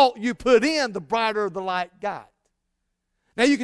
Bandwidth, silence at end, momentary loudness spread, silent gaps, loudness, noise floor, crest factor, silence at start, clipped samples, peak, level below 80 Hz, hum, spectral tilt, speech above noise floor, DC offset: 11 kHz; 0 s; 13 LU; none; -23 LUFS; -77 dBFS; 18 dB; 0 s; under 0.1%; -4 dBFS; -56 dBFS; none; -4 dB/octave; 54 dB; under 0.1%